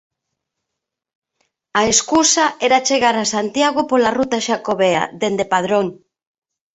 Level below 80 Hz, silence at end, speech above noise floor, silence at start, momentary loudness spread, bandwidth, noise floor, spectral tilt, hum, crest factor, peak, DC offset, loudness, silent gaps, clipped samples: -56 dBFS; 0.8 s; 64 dB; 1.75 s; 6 LU; 8.4 kHz; -81 dBFS; -2.5 dB/octave; none; 18 dB; 0 dBFS; under 0.1%; -16 LUFS; none; under 0.1%